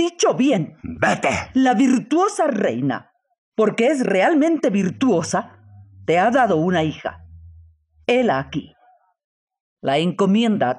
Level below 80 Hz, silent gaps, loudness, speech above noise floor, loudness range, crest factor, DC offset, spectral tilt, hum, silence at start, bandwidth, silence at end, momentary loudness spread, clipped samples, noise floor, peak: -58 dBFS; 3.38-3.52 s, 9.24-9.47 s, 9.60-9.77 s; -19 LUFS; 39 dB; 5 LU; 16 dB; under 0.1%; -5.5 dB/octave; none; 0 s; 11 kHz; 0 s; 13 LU; under 0.1%; -57 dBFS; -4 dBFS